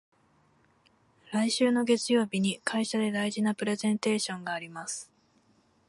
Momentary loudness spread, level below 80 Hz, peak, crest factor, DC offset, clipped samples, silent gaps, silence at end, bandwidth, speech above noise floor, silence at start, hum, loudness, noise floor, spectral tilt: 11 LU; -76 dBFS; -12 dBFS; 18 dB; under 0.1%; under 0.1%; none; 0.85 s; 11.5 kHz; 38 dB; 1.3 s; none; -29 LUFS; -66 dBFS; -4 dB/octave